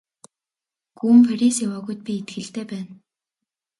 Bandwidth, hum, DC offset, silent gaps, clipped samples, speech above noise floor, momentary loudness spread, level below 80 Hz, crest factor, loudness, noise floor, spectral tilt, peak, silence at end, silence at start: 11.5 kHz; none; under 0.1%; none; under 0.1%; 70 dB; 18 LU; -70 dBFS; 18 dB; -20 LUFS; -89 dBFS; -5 dB/octave; -4 dBFS; 0.85 s; 1.05 s